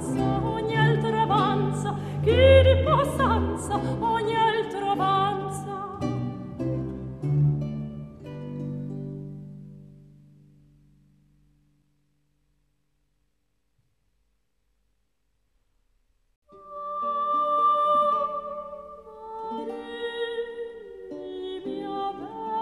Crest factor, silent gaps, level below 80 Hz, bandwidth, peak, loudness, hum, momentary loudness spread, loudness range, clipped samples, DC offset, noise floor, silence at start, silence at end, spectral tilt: 22 dB; 16.36-16.42 s; -44 dBFS; 13 kHz; -4 dBFS; -25 LUFS; none; 17 LU; 17 LU; under 0.1%; under 0.1%; -75 dBFS; 0 s; 0 s; -6.5 dB/octave